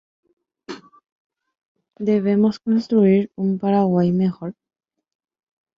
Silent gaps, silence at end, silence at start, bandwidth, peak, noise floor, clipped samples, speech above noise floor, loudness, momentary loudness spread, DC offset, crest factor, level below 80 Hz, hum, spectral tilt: 1.12-1.30 s, 1.65-1.75 s; 1.25 s; 0.7 s; 7 kHz; -6 dBFS; -38 dBFS; under 0.1%; 20 dB; -19 LUFS; 21 LU; under 0.1%; 16 dB; -64 dBFS; none; -9.5 dB/octave